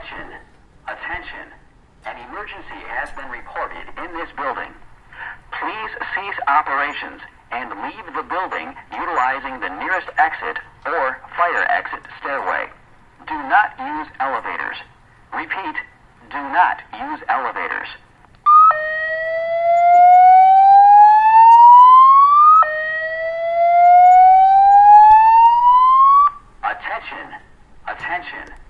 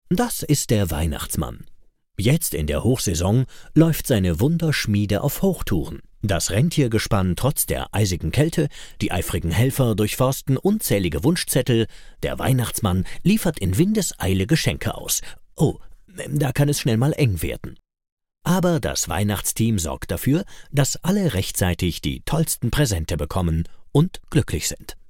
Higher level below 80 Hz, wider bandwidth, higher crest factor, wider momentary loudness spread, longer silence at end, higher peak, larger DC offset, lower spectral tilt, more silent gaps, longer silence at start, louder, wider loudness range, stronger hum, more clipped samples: second, -50 dBFS vs -36 dBFS; second, 7.2 kHz vs 17 kHz; about the same, 14 dB vs 18 dB; first, 23 LU vs 7 LU; first, 0.25 s vs 0.05 s; first, 0 dBFS vs -4 dBFS; neither; about the same, -4.5 dB/octave vs -5 dB/octave; second, none vs 18.12-18.17 s; about the same, 0 s vs 0.1 s; first, -12 LUFS vs -22 LUFS; first, 20 LU vs 2 LU; neither; neither